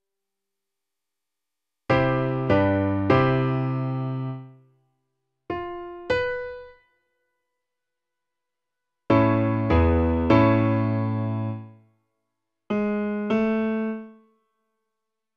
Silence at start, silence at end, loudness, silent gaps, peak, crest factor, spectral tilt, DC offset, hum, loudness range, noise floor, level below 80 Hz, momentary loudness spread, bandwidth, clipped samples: 1.9 s; 1.25 s; -23 LUFS; none; -4 dBFS; 20 dB; -9.5 dB/octave; under 0.1%; none; 11 LU; -86 dBFS; -42 dBFS; 14 LU; 6.6 kHz; under 0.1%